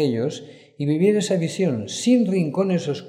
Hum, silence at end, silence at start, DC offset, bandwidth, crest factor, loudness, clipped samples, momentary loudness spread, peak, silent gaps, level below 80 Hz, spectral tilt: none; 0 s; 0 s; under 0.1%; 12.5 kHz; 14 dB; -21 LUFS; under 0.1%; 9 LU; -6 dBFS; none; -72 dBFS; -6 dB/octave